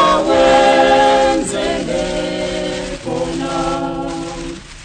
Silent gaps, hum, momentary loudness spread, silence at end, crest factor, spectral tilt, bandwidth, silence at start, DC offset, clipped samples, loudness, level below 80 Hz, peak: none; none; 13 LU; 0 s; 16 dB; -4 dB/octave; 9.6 kHz; 0 s; under 0.1%; under 0.1%; -15 LUFS; -36 dBFS; 0 dBFS